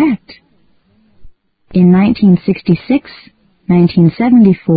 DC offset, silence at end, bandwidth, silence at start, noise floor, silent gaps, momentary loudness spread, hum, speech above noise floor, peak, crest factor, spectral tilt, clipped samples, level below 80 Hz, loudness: under 0.1%; 0 s; 5 kHz; 0 s; -54 dBFS; none; 8 LU; none; 45 dB; 0 dBFS; 12 dB; -12.5 dB/octave; 0.1%; -42 dBFS; -11 LUFS